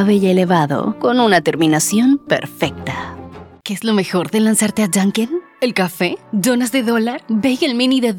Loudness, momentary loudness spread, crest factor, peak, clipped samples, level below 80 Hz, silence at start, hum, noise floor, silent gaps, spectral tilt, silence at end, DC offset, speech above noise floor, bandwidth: -16 LUFS; 10 LU; 14 dB; 0 dBFS; under 0.1%; -54 dBFS; 0 s; none; -35 dBFS; none; -4.5 dB/octave; 0 s; under 0.1%; 20 dB; 18.5 kHz